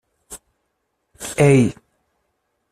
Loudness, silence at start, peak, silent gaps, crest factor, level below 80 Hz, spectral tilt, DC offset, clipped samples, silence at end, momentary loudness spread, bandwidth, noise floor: -17 LUFS; 0.3 s; -2 dBFS; none; 20 dB; -50 dBFS; -6.5 dB/octave; under 0.1%; under 0.1%; 1 s; 25 LU; 13.5 kHz; -73 dBFS